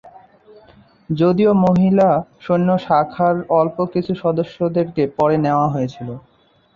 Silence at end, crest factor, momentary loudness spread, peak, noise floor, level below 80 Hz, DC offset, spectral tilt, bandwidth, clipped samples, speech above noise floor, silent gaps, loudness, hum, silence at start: 0.55 s; 14 dB; 9 LU; -2 dBFS; -49 dBFS; -52 dBFS; under 0.1%; -9.5 dB/octave; 7 kHz; under 0.1%; 32 dB; none; -17 LUFS; none; 0.05 s